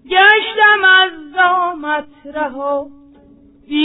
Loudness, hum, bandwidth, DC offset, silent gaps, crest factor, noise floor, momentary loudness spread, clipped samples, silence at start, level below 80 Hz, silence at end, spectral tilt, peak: -13 LUFS; none; 4.1 kHz; under 0.1%; none; 14 dB; -46 dBFS; 14 LU; under 0.1%; 0.1 s; -56 dBFS; 0 s; -5 dB/octave; 0 dBFS